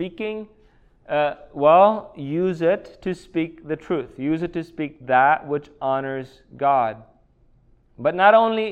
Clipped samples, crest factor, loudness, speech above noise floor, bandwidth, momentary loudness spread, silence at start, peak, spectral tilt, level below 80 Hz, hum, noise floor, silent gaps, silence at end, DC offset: under 0.1%; 20 dB; -21 LUFS; 36 dB; 8.6 kHz; 15 LU; 0 s; -2 dBFS; -7.5 dB/octave; -56 dBFS; none; -57 dBFS; none; 0 s; under 0.1%